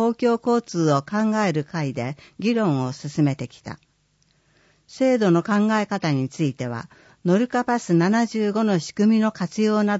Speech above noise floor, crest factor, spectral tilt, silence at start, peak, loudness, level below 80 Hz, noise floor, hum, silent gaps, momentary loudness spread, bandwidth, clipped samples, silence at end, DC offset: 43 dB; 16 dB; -6.5 dB/octave; 0 s; -6 dBFS; -22 LUFS; -66 dBFS; -64 dBFS; none; none; 11 LU; 8 kHz; under 0.1%; 0 s; under 0.1%